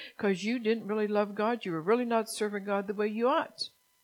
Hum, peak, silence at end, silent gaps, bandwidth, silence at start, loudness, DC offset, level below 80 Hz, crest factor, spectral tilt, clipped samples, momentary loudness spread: none; -14 dBFS; 0.35 s; none; 16.5 kHz; 0 s; -31 LUFS; under 0.1%; -86 dBFS; 16 dB; -5 dB/octave; under 0.1%; 5 LU